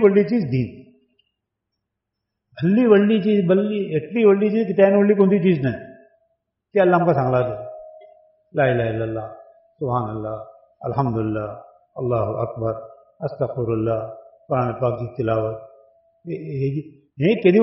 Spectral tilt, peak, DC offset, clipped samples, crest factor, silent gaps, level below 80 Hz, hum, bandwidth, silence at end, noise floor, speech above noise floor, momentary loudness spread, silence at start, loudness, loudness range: -7.5 dB/octave; -4 dBFS; under 0.1%; under 0.1%; 18 dB; none; -54 dBFS; none; 5.8 kHz; 0 s; -81 dBFS; 62 dB; 17 LU; 0 s; -20 LUFS; 8 LU